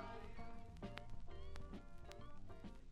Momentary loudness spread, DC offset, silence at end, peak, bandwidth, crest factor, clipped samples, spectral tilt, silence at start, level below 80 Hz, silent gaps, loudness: 5 LU; under 0.1%; 0 s; -28 dBFS; 9.6 kHz; 22 dB; under 0.1%; -6 dB/octave; 0 s; -56 dBFS; none; -57 LUFS